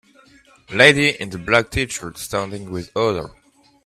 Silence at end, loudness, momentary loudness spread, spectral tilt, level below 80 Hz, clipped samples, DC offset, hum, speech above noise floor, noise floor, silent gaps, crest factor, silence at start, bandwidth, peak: 0.55 s; -18 LUFS; 16 LU; -4 dB/octave; -46 dBFS; under 0.1%; under 0.1%; none; 32 dB; -51 dBFS; none; 20 dB; 0.7 s; 15 kHz; 0 dBFS